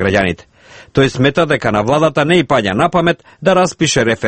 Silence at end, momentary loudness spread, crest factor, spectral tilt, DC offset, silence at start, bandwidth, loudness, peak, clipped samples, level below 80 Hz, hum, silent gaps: 0 s; 5 LU; 14 dB; -5 dB/octave; under 0.1%; 0 s; 8.8 kHz; -13 LUFS; 0 dBFS; under 0.1%; -42 dBFS; none; none